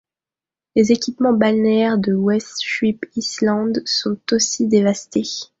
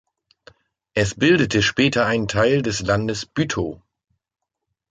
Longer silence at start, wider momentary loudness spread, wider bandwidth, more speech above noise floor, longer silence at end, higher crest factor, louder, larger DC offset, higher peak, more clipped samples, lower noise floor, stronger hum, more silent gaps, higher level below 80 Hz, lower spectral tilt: second, 0.75 s vs 0.95 s; about the same, 7 LU vs 8 LU; second, 7.8 kHz vs 9.4 kHz; first, over 72 dB vs 60 dB; second, 0.15 s vs 1.15 s; about the same, 18 dB vs 18 dB; about the same, -18 LUFS vs -20 LUFS; neither; first, 0 dBFS vs -4 dBFS; neither; first, under -90 dBFS vs -79 dBFS; neither; neither; second, -58 dBFS vs -46 dBFS; about the same, -4.5 dB/octave vs -5 dB/octave